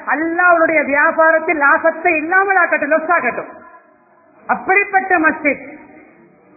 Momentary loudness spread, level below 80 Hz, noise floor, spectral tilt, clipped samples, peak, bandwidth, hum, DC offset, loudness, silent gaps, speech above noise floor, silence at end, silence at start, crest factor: 9 LU; -58 dBFS; -50 dBFS; -11.5 dB/octave; under 0.1%; 0 dBFS; 2.7 kHz; none; under 0.1%; -13 LUFS; none; 36 dB; 0.75 s; 0 s; 16 dB